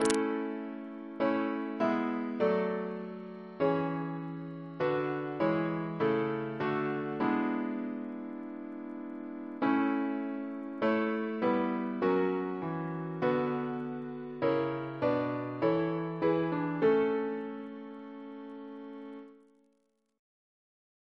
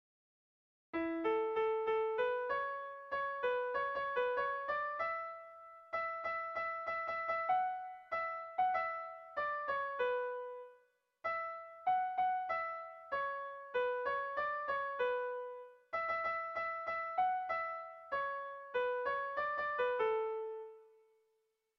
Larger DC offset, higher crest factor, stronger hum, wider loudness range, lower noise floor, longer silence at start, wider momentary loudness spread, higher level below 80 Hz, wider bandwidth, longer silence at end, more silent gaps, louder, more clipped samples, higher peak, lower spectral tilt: neither; first, 24 dB vs 14 dB; neither; about the same, 4 LU vs 2 LU; second, -75 dBFS vs -81 dBFS; second, 0 s vs 0.95 s; first, 13 LU vs 10 LU; about the same, -72 dBFS vs -76 dBFS; first, 11 kHz vs 6.4 kHz; first, 1.8 s vs 0.9 s; neither; first, -33 LUFS vs -38 LUFS; neither; first, -8 dBFS vs -24 dBFS; first, -6.5 dB/octave vs -0.5 dB/octave